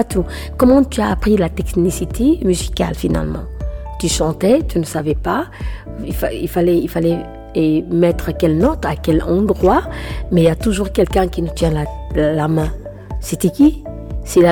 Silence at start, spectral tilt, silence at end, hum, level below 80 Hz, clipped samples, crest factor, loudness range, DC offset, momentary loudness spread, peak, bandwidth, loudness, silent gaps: 0 s; -6.5 dB/octave; 0 s; none; -26 dBFS; under 0.1%; 12 dB; 3 LU; under 0.1%; 12 LU; -2 dBFS; over 20 kHz; -17 LUFS; none